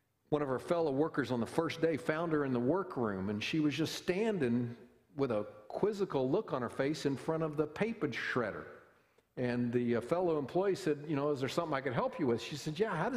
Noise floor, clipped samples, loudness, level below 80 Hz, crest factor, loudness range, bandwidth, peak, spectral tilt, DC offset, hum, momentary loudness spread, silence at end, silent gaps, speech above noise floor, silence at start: -69 dBFS; under 0.1%; -35 LUFS; -68 dBFS; 20 dB; 2 LU; 15 kHz; -16 dBFS; -6.5 dB/octave; under 0.1%; none; 5 LU; 0 s; none; 35 dB; 0.3 s